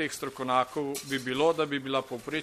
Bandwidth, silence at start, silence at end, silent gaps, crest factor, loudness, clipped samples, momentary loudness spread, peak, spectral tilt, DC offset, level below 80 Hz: 15.5 kHz; 0 s; 0 s; none; 18 dB; -30 LUFS; under 0.1%; 7 LU; -12 dBFS; -4 dB/octave; under 0.1%; -66 dBFS